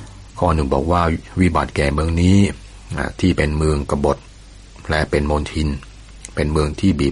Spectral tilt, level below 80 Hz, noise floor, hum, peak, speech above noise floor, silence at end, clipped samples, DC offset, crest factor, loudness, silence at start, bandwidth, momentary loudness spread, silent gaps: -6.5 dB/octave; -28 dBFS; -40 dBFS; none; -2 dBFS; 23 dB; 0 s; under 0.1%; under 0.1%; 16 dB; -19 LUFS; 0 s; 11.5 kHz; 12 LU; none